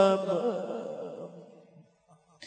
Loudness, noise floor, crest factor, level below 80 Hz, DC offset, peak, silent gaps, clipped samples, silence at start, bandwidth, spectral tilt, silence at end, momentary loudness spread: -31 LUFS; -63 dBFS; 22 dB; -86 dBFS; under 0.1%; -10 dBFS; none; under 0.1%; 0 s; 9.2 kHz; -6 dB/octave; 0 s; 22 LU